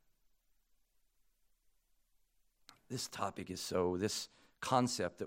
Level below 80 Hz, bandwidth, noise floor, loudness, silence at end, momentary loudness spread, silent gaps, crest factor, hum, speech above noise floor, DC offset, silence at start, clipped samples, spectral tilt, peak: -76 dBFS; 16.5 kHz; -75 dBFS; -38 LUFS; 0 s; 12 LU; none; 26 dB; none; 37 dB; under 0.1%; 2.9 s; under 0.1%; -4 dB/octave; -16 dBFS